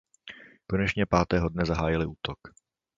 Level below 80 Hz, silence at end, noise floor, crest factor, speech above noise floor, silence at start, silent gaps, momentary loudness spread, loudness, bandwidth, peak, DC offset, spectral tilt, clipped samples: -42 dBFS; 0.5 s; -49 dBFS; 22 dB; 22 dB; 0.25 s; none; 21 LU; -27 LUFS; 7.6 kHz; -6 dBFS; under 0.1%; -6.5 dB/octave; under 0.1%